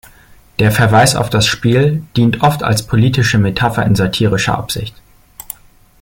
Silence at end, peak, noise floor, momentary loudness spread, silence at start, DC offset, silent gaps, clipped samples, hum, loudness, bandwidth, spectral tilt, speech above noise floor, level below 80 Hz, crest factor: 1.1 s; 0 dBFS; -43 dBFS; 15 LU; 0.6 s; under 0.1%; none; under 0.1%; none; -13 LUFS; 17 kHz; -5 dB/octave; 31 dB; -38 dBFS; 14 dB